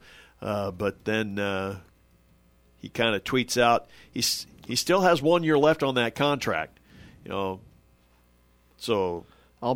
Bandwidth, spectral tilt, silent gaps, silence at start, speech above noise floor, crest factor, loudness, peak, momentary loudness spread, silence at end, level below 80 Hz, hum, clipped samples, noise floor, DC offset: 18.5 kHz; -4 dB/octave; none; 0.4 s; 36 dB; 20 dB; -26 LUFS; -8 dBFS; 16 LU; 0 s; -58 dBFS; none; under 0.1%; -61 dBFS; under 0.1%